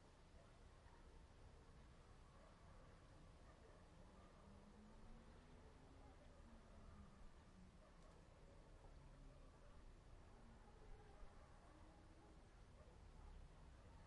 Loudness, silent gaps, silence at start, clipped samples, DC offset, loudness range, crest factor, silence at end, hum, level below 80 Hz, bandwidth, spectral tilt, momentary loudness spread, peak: -68 LUFS; none; 0 s; under 0.1%; under 0.1%; 1 LU; 16 dB; 0 s; none; -66 dBFS; 10.5 kHz; -6 dB/octave; 2 LU; -48 dBFS